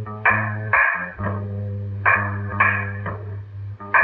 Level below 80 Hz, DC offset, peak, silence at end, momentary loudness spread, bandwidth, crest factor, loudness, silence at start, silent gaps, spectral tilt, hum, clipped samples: -50 dBFS; under 0.1%; -2 dBFS; 0 s; 15 LU; 4.1 kHz; 20 dB; -21 LUFS; 0 s; none; -10 dB/octave; none; under 0.1%